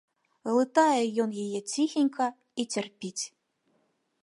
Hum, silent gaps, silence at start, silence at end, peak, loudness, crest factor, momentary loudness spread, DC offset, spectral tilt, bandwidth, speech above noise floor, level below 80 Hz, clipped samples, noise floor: none; none; 0.45 s; 0.95 s; -10 dBFS; -28 LUFS; 18 dB; 13 LU; under 0.1%; -3.5 dB/octave; 11.5 kHz; 45 dB; -82 dBFS; under 0.1%; -73 dBFS